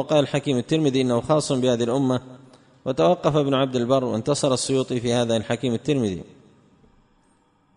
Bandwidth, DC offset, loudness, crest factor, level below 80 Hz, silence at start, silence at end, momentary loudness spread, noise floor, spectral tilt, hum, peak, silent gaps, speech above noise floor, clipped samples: 10.5 kHz; under 0.1%; -22 LUFS; 18 dB; -56 dBFS; 0 s; 1.55 s; 4 LU; -62 dBFS; -5.5 dB/octave; none; -4 dBFS; none; 40 dB; under 0.1%